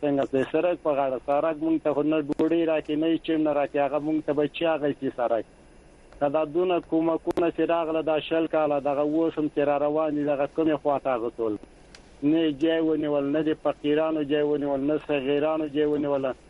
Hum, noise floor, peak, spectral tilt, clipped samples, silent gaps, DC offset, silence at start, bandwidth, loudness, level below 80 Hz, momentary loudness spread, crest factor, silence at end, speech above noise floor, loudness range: none; -51 dBFS; -10 dBFS; -7.5 dB/octave; under 0.1%; none; under 0.1%; 0 s; 10.5 kHz; -25 LUFS; -58 dBFS; 3 LU; 14 dB; 0.15 s; 27 dB; 2 LU